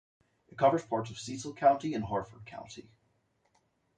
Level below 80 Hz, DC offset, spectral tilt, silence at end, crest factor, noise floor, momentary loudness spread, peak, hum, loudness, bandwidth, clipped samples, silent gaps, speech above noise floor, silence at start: -64 dBFS; under 0.1%; -5.5 dB/octave; 1.15 s; 22 dB; -74 dBFS; 20 LU; -12 dBFS; none; -31 LUFS; 9.4 kHz; under 0.1%; none; 43 dB; 0.55 s